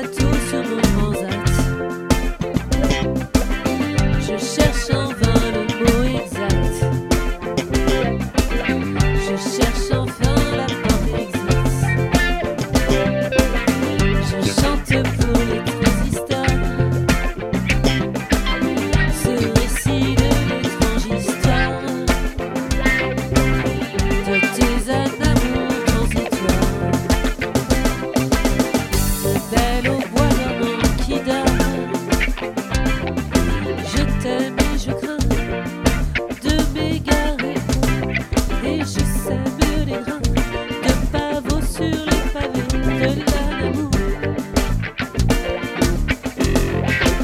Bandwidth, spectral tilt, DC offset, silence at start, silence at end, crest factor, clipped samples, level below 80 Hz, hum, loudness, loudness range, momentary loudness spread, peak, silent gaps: 16.5 kHz; -5.5 dB/octave; under 0.1%; 0 s; 0 s; 18 dB; under 0.1%; -24 dBFS; none; -19 LUFS; 2 LU; 4 LU; 0 dBFS; none